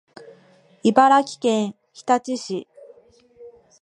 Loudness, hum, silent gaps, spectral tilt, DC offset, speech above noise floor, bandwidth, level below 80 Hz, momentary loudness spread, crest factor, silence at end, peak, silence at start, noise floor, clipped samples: -20 LUFS; none; none; -4.5 dB/octave; under 0.1%; 35 dB; 11 kHz; -74 dBFS; 16 LU; 22 dB; 0.3 s; 0 dBFS; 0.85 s; -54 dBFS; under 0.1%